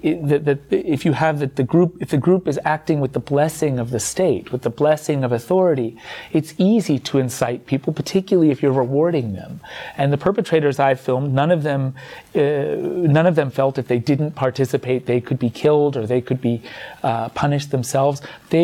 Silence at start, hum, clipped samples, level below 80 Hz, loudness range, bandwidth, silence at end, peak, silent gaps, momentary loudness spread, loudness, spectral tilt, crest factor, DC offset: 0.05 s; none; under 0.1%; -54 dBFS; 1 LU; 16 kHz; 0 s; -4 dBFS; none; 7 LU; -19 LUFS; -6.5 dB/octave; 14 dB; under 0.1%